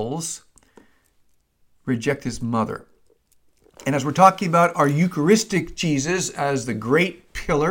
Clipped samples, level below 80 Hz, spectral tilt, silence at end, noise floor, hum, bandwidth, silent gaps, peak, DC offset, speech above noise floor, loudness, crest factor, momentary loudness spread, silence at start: under 0.1%; -48 dBFS; -5 dB/octave; 0 s; -62 dBFS; none; 17 kHz; none; 0 dBFS; under 0.1%; 41 dB; -21 LUFS; 22 dB; 14 LU; 0 s